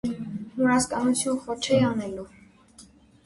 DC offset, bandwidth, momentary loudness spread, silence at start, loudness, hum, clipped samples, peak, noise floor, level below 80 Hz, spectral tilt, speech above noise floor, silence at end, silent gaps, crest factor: under 0.1%; 11.5 kHz; 13 LU; 0.05 s; -25 LUFS; none; under 0.1%; -10 dBFS; -53 dBFS; -56 dBFS; -4.5 dB/octave; 29 dB; 0.45 s; none; 18 dB